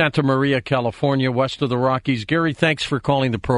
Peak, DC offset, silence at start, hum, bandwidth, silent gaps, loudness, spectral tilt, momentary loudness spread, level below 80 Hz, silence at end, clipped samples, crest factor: -2 dBFS; under 0.1%; 0 s; none; 11 kHz; none; -20 LUFS; -6.5 dB/octave; 3 LU; -48 dBFS; 0 s; under 0.1%; 18 dB